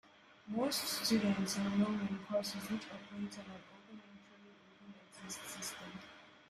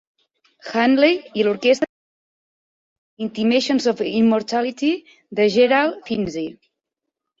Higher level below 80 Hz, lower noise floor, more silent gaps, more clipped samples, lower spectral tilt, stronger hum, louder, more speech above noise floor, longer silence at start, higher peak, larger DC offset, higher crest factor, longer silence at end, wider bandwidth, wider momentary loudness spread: second, -74 dBFS vs -62 dBFS; second, -61 dBFS vs -82 dBFS; second, none vs 1.89-3.17 s; neither; about the same, -4 dB/octave vs -5 dB/octave; neither; second, -38 LUFS vs -19 LUFS; second, 23 dB vs 64 dB; second, 0.05 s vs 0.65 s; second, -22 dBFS vs -4 dBFS; neither; about the same, 20 dB vs 18 dB; second, 0.1 s vs 0.9 s; first, 14.5 kHz vs 7.8 kHz; first, 23 LU vs 14 LU